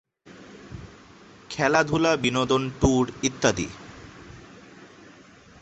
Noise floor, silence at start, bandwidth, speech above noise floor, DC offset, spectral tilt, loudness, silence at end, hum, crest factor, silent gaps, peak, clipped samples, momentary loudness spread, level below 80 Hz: -50 dBFS; 0.25 s; 8.4 kHz; 28 dB; under 0.1%; -4.5 dB/octave; -23 LUFS; 0.75 s; none; 24 dB; none; -4 dBFS; under 0.1%; 24 LU; -44 dBFS